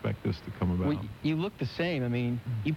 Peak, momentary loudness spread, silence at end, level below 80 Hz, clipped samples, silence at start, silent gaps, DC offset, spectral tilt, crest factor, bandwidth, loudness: -18 dBFS; 4 LU; 0 s; -54 dBFS; under 0.1%; 0 s; none; under 0.1%; -8 dB/octave; 14 dB; 15.5 kHz; -32 LUFS